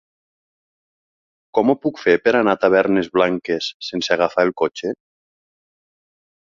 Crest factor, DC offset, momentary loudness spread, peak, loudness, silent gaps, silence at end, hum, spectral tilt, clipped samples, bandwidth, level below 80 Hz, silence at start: 20 dB; under 0.1%; 9 LU; -2 dBFS; -18 LUFS; 3.74-3.80 s; 1.55 s; none; -5 dB/octave; under 0.1%; 7.6 kHz; -60 dBFS; 1.55 s